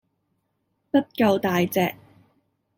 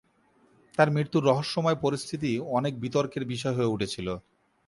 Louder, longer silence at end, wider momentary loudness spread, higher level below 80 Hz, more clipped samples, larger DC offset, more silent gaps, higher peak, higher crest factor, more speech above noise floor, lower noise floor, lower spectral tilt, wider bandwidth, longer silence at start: first, -23 LUFS vs -28 LUFS; first, 0.85 s vs 0.45 s; second, 4 LU vs 8 LU; about the same, -62 dBFS vs -60 dBFS; neither; neither; neither; about the same, -8 dBFS vs -6 dBFS; about the same, 18 dB vs 22 dB; first, 52 dB vs 37 dB; first, -74 dBFS vs -64 dBFS; about the same, -6 dB/octave vs -6 dB/octave; first, 16.5 kHz vs 11.5 kHz; first, 0.95 s vs 0.8 s